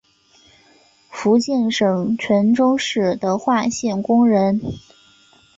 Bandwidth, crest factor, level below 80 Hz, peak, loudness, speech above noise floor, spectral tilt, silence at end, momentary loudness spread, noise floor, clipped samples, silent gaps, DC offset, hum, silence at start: 7.8 kHz; 14 dB; -54 dBFS; -6 dBFS; -18 LUFS; 37 dB; -5.5 dB/octave; 0.8 s; 8 LU; -54 dBFS; under 0.1%; none; under 0.1%; none; 1.1 s